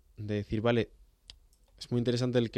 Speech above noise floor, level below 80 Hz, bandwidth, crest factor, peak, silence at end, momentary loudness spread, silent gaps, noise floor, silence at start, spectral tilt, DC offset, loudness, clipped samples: 31 dB; -56 dBFS; 11 kHz; 18 dB; -14 dBFS; 0 s; 9 LU; none; -61 dBFS; 0.2 s; -7 dB/octave; under 0.1%; -31 LUFS; under 0.1%